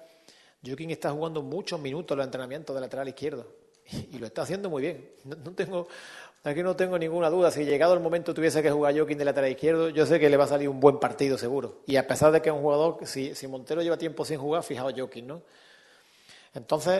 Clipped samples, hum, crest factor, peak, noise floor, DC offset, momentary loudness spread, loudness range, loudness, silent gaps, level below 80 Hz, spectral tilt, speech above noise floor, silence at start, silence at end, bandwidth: under 0.1%; none; 24 dB; -4 dBFS; -58 dBFS; under 0.1%; 18 LU; 11 LU; -27 LUFS; none; -66 dBFS; -5.5 dB/octave; 32 dB; 0 s; 0 s; 12.5 kHz